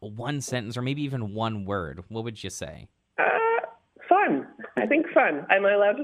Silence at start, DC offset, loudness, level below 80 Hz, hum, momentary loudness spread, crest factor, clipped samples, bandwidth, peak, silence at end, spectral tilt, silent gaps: 0 s; under 0.1%; -25 LUFS; -60 dBFS; none; 14 LU; 20 dB; under 0.1%; 13.5 kHz; -6 dBFS; 0 s; -5.5 dB/octave; none